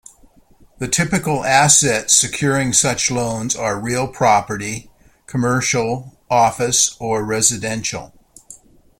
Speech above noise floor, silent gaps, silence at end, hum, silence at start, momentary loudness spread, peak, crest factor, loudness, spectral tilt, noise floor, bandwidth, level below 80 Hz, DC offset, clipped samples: 33 dB; none; 0.45 s; none; 0.8 s; 12 LU; 0 dBFS; 18 dB; -16 LUFS; -3 dB/octave; -50 dBFS; 16.5 kHz; -48 dBFS; under 0.1%; under 0.1%